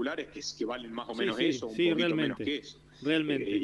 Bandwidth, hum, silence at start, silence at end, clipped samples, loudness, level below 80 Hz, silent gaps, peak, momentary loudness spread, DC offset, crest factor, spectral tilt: 11 kHz; none; 0 s; 0 s; under 0.1%; -31 LUFS; -66 dBFS; none; -14 dBFS; 10 LU; under 0.1%; 18 dB; -4.5 dB/octave